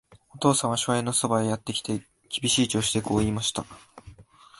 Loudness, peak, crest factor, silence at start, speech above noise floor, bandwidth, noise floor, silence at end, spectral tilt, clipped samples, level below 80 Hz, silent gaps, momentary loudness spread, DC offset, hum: -25 LUFS; -6 dBFS; 20 dB; 0.1 s; 26 dB; 12 kHz; -51 dBFS; 0.4 s; -4 dB/octave; under 0.1%; -52 dBFS; none; 11 LU; under 0.1%; none